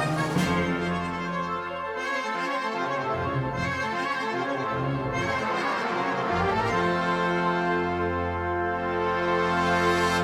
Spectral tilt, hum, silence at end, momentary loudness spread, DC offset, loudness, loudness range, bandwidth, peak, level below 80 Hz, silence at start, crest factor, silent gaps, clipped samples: -5.5 dB/octave; none; 0 s; 5 LU; under 0.1%; -26 LUFS; 3 LU; 15 kHz; -10 dBFS; -50 dBFS; 0 s; 16 dB; none; under 0.1%